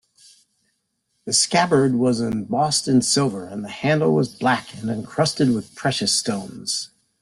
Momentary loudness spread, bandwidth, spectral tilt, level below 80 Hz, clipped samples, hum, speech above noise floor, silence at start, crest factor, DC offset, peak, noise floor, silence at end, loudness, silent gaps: 11 LU; 12.5 kHz; -4 dB/octave; -58 dBFS; under 0.1%; none; 51 dB; 1.25 s; 18 dB; under 0.1%; -4 dBFS; -72 dBFS; 0.35 s; -20 LUFS; none